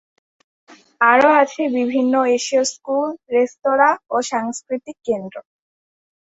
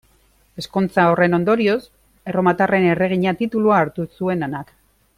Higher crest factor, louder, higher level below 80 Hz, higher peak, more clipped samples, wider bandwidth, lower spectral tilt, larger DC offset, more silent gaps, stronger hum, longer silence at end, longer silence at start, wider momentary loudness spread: about the same, 18 dB vs 16 dB; about the same, -18 LUFS vs -18 LUFS; second, -66 dBFS vs -54 dBFS; about the same, -2 dBFS vs -4 dBFS; neither; second, 8.2 kHz vs 14.5 kHz; second, -3 dB/octave vs -7.5 dB/octave; neither; neither; neither; first, 0.8 s vs 0.55 s; first, 1 s vs 0.55 s; about the same, 12 LU vs 10 LU